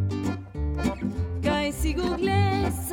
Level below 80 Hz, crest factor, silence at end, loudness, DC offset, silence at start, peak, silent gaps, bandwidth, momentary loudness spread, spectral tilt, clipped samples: -36 dBFS; 14 dB; 0 s; -27 LUFS; under 0.1%; 0 s; -12 dBFS; none; 18.5 kHz; 8 LU; -6 dB/octave; under 0.1%